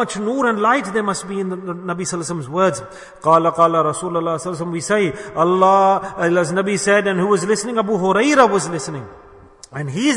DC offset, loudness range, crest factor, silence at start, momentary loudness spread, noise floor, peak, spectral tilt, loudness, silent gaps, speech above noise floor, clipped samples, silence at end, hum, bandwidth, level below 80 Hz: under 0.1%; 3 LU; 16 dB; 0 s; 12 LU; -43 dBFS; 0 dBFS; -5 dB/octave; -17 LUFS; none; 26 dB; under 0.1%; 0 s; none; 11 kHz; -56 dBFS